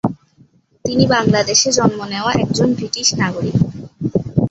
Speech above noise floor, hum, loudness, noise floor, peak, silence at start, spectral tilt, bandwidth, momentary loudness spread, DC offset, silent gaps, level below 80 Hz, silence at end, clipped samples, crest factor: 36 dB; none; -16 LUFS; -52 dBFS; 0 dBFS; 0.05 s; -4 dB/octave; 8.2 kHz; 9 LU; under 0.1%; none; -42 dBFS; 0 s; under 0.1%; 16 dB